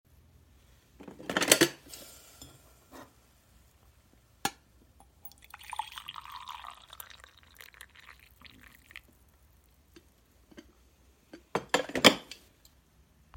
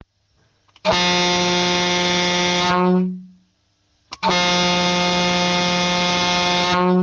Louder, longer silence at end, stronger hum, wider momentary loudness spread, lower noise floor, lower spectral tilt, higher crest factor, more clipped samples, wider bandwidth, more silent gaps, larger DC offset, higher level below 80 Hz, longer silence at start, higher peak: second, -29 LUFS vs -17 LUFS; first, 1.15 s vs 0 s; neither; first, 30 LU vs 4 LU; about the same, -64 dBFS vs -64 dBFS; second, -2 dB/octave vs -3.5 dB/octave; first, 34 dB vs 14 dB; neither; first, 17 kHz vs 9.8 kHz; neither; neither; second, -64 dBFS vs -48 dBFS; first, 1 s vs 0.85 s; first, -2 dBFS vs -6 dBFS